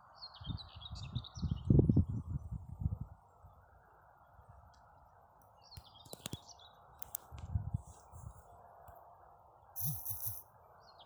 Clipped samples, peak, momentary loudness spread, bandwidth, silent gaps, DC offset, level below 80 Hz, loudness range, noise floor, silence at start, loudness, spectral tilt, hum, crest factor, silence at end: under 0.1%; -14 dBFS; 27 LU; over 20 kHz; none; under 0.1%; -50 dBFS; 17 LU; -64 dBFS; 0.15 s; -39 LUFS; -6.5 dB/octave; none; 26 dB; 0 s